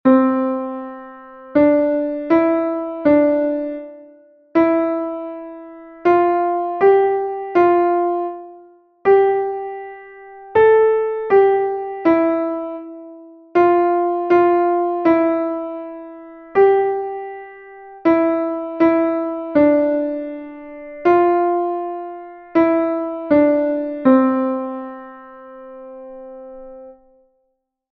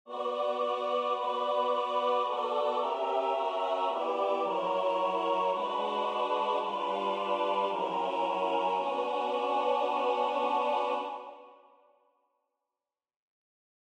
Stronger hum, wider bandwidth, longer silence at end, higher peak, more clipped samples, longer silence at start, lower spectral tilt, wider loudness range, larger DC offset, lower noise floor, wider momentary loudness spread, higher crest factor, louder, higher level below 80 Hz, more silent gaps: neither; second, 4.8 kHz vs 10 kHz; second, 1 s vs 2.4 s; first, -2 dBFS vs -16 dBFS; neither; about the same, 0.05 s vs 0.05 s; first, -8.5 dB/octave vs -4.5 dB/octave; about the same, 3 LU vs 3 LU; neither; second, -71 dBFS vs under -90 dBFS; first, 21 LU vs 2 LU; about the same, 16 dB vs 14 dB; first, -17 LUFS vs -30 LUFS; first, -58 dBFS vs under -90 dBFS; neither